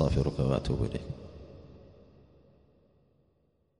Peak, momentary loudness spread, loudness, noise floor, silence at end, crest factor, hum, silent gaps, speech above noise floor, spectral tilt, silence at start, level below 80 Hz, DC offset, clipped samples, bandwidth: -12 dBFS; 24 LU; -32 LUFS; -72 dBFS; 2 s; 22 dB; none; none; 42 dB; -8 dB/octave; 0 s; -44 dBFS; under 0.1%; under 0.1%; 10.5 kHz